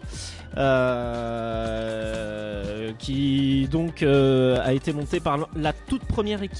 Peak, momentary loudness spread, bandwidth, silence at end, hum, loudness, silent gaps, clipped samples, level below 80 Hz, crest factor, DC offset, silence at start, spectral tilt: -10 dBFS; 11 LU; 11.5 kHz; 0 s; none; -24 LUFS; none; under 0.1%; -40 dBFS; 14 dB; under 0.1%; 0 s; -6.5 dB/octave